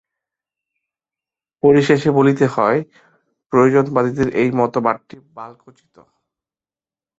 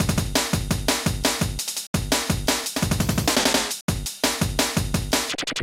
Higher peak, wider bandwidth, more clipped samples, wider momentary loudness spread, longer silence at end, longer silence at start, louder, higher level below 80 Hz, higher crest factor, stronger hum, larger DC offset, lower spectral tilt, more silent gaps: first, 0 dBFS vs -6 dBFS; second, 8 kHz vs 17 kHz; neither; first, 22 LU vs 5 LU; first, 1.65 s vs 0 s; first, 1.65 s vs 0 s; first, -16 LUFS vs -23 LUFS; second, -54 dBFS vs -36 dBFS; about the same, 18 dB vs 18 dB; neither; neither; first, -7.5 dB/octave vs -3.5 dB/octave; second, 3.46-3.50 s vs 1.87-1.94 s, 3.81-3.88 s